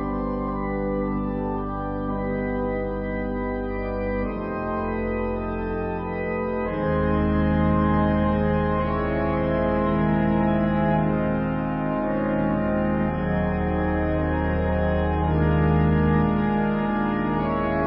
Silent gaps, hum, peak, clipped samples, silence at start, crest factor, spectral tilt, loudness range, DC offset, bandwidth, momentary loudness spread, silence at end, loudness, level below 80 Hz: none; none; -10 dBFS; under 0.1%; 0 s; 14 dB; -12.5 dB/octave; 5 LU; under 0.1%; 5.2 kHz; 7 LU; 0 s; -24 LUFS; -32 dBFS